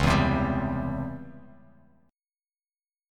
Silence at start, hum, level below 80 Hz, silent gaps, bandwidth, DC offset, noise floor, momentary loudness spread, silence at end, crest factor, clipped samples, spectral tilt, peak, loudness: 0 s; none; -40 dBFS; none; 14 kHz; under 0.1%; under -90 dBFS; 18 LU; 1.7 s; 22 dB; under 0.1%; -6.5 dB/octave; -8 dBFS; -27 LUFS